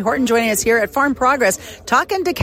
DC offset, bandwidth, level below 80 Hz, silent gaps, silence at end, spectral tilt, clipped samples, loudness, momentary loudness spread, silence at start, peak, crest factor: under 0.1%; 16.5 kHz; -46 dBFS; none; 0 s; -3.5 dB/octave; under 0.1%; -16 LUFS; 3 LU; 0 s; -4 dBFS; 14 dB